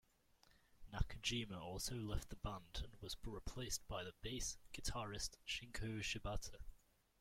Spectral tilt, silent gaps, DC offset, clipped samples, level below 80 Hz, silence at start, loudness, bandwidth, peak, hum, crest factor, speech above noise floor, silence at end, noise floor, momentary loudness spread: -3 dB/octave; none; under 0.1%; under 0.1%; -54 dBFS; 0.5 s; -47 LUFS; 16.5 kHz; -24 dBFS; none; 24 dB; 27 dB; 0.45 s; -74 dBFS; 8 LU